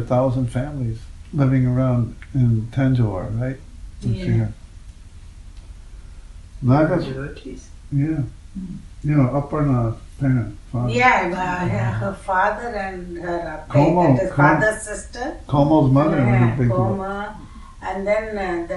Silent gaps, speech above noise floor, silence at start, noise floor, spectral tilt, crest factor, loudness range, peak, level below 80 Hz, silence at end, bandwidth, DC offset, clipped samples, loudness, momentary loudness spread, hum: none; 20 dB; 0 s; -40 dBFS; -7.5 dB/octave; 18 dB; 7 LU; -2 dBFS; -38 dBFS; 0 s; 11.5 kHz; under 0.1%; under 0.1%; -20 LUFS; 15 LU; none